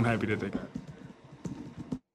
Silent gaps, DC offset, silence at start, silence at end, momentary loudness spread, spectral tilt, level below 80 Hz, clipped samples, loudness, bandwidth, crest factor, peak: none; under 0.1%; 0 s; 0.15 s; 19 LU; -7 dB/octave; -58 dBFS; under 0.1%; -36 LUFS; 11 kHz; 18 dB; -16 dBFS